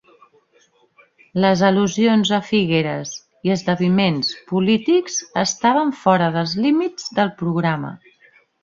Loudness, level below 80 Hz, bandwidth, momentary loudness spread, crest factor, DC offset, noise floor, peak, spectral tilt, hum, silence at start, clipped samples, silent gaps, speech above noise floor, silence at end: -19 LUFS; -58 dBFS; 7.4 kHz; 8 LU; 18 dB; under 0.1%; -58 dBFS; -2 dBFS; -5 dB/octave; none; 1.35 s; under 0.1%; none; 40 dB; 0.65 s